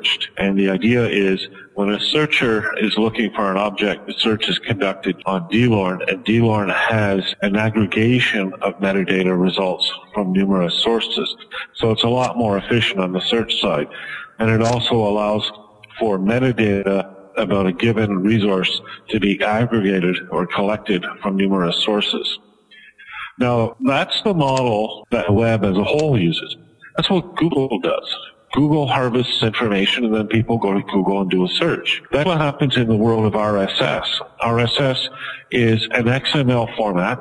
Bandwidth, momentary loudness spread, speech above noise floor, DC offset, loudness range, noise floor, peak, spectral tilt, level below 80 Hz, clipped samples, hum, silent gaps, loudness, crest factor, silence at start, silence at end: 11 kHz; 6 LU; 29 dB; under 0.1%; 2 LU; -47 dBFS; 0 dBFS; -6 dB/octave; -48 dBFS; under 0.1%; none; none; -18 LUFS; 18 dB; 0 s; 0 s